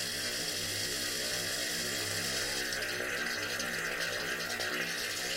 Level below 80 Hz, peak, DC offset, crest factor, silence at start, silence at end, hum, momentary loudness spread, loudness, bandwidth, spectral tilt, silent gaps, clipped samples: -60 dBFS; -20 dBFS; under 0.1%; 16 dB; 0 s; 0 s; none; 1 LU; -33 LUFS; 16 kHz; -1 dB/octave; none; under 0.1%